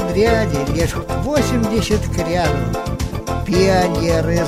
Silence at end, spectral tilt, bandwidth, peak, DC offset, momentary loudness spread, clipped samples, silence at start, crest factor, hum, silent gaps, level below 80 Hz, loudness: 0 s; -6 dB/octave; 16 kHz; -2 dBFS; under 0.1%; 8 LU; under 0.1%; 0 s; 14 dB; none; none; -28 dBFS; -18 LUFS